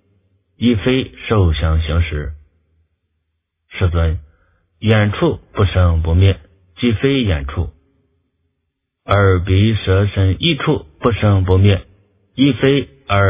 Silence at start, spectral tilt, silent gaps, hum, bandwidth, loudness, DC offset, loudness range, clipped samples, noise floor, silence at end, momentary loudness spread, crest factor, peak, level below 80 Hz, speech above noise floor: 0.6 s; -11 dB/octave; none; none; 3.8 kHz; -16 LUFS; under 0.1%; 5 LU; under 0.1%; -73 dBFS; 0 s; 9 LU; 16 dB; 0 dBFS; -24 dBFS; 59 dB